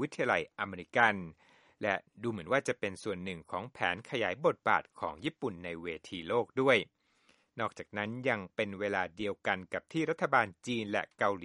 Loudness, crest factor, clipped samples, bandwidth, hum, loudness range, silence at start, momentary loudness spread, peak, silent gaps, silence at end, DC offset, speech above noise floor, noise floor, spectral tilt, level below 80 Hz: -33 LUFS; 24 dB; under 0.1%; 11.5 kHz; none; 2 LU; 0 s; 12 LU; -10 dBFS; none; 0 s; under 0.1%; 36 dB; -70 dBFS; -5 dB/octave; -70 dBFS